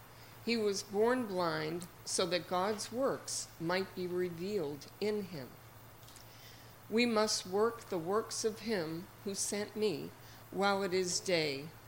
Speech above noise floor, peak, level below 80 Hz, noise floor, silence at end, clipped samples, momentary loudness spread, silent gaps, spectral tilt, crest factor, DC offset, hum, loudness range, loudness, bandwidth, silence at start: 19 dB; -16 dBFS; -68 dBFS; -55 dBFS; 0 s; under 0.1%; 21 LU; none; -3.5 dB/octave; 20 dB; under 0.1%; none; 4 LU; -35 LUFS; 16.5 kHz; 0 s